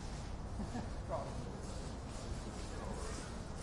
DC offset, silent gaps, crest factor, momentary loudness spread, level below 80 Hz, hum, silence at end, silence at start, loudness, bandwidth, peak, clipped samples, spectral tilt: under 0.1%; none; 14 dB; 4 LU; -48 dBFS; none; 0 s; 0 s; -45 LUFS; 11.5 kHz; -30 dBFS; under 0.1%; -5.5 dB/octave